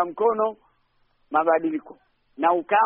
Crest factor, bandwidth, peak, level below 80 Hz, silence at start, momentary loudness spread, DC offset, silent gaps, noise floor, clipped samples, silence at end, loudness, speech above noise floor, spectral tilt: 16 dB; 3.7 kHz; -8 dBFS; -70 dBFS; 0 s; 7 LU; under 0.1%; none; -66 dBFS; under 0.1%; 0 s; -23 LUFS; 44 dB; -3 dB/octave